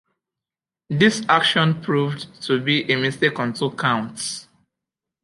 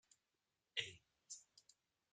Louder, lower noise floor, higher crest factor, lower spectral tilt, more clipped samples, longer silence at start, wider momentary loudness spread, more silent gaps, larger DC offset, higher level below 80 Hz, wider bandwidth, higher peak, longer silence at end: first, -20 LUFS vs -50 LUFS; about the same, -90 dBFS vs under -90 dBFS; second, 20 dB vs 30 dB; first, -4.5 dB/octave vs 0 dB/octave; neither; first, 0.9 s vs 0.75 s; second, 12 LU vs 22 LU; neither; neither; first, -64 dBFS vs -90 dBFS; first, 11.5 kHz vs 9.4 kHz; first, -2 dBFS vs -26 dBFS; first, 0.8 s vs 0.5 s